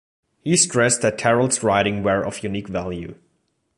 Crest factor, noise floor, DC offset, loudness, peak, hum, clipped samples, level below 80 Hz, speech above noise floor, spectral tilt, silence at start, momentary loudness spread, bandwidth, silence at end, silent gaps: 18 dB; -69 dBFS; under 0.1%; -20 LUFS; -4 dBFS; none; under 0.1%; -50 dBFS; 49 dB; -3.5 dB/octave; 0.45 s; 14 LU; 11.5 kHz; 0.65 s; none